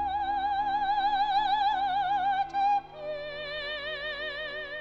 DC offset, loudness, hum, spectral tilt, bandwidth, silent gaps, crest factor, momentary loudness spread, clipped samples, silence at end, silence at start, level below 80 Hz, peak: under 0.1%; -29 LUFS; 50 Hz at -60 dBFS; -4 dB/octave; 7 kHz; none; 12 dB; 9 LU; under 0.1%; 0 s; 0 s; -54 dBFS; -18 dBFS